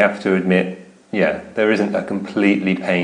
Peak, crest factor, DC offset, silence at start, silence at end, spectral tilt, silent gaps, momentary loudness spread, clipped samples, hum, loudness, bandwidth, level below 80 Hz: 0 dBFS; 18 dB; under 0.1%; 0 s; 0 s; -7 dB/octave; none; 8 LU; under 0.1%; none; -19 LUFS; 10 kHz; -60 dBFS